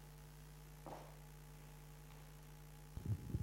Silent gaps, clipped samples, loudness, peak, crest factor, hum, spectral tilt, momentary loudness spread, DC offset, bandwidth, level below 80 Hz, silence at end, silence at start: none; under 0.1%; -54 LUFS; -32 dBFS; 20 dB; none; -6.5 dB/octave; 12 LU; under 0.1%; 16 kHz; -58 dBFS; 0 s; 0 s